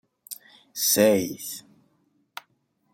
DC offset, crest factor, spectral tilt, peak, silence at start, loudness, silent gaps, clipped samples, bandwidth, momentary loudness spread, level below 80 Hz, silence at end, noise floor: under 0.1%; 22 dB; -3 dB/octave; -6 dBFS; 0.3 s; -22 LUFS; none; under 0.1%; 17 kHz; 24 LU; -70 dBFS; 1.35 s; -70 dBFS